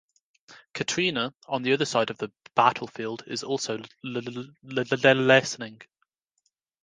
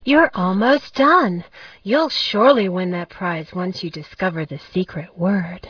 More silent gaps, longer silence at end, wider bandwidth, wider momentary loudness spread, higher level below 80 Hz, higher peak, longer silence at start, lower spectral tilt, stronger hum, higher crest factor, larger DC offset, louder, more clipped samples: neither; first, 1 s vs 0 s; first, 10 kHz vs 5.4 kHz; about the same, 15 LU vs 13 LU; second, -72 dBFS vs -56 dBFS; about the same, -4 dBFS vs -2 dBFS; first, 0.5 s vs 0.05 s; second, -4 dB/octave vs -6.5 dB/octave; neither; first, 24 dB vs 18 dB; neither; second, -25 LUFS vs -19 LUFS; neither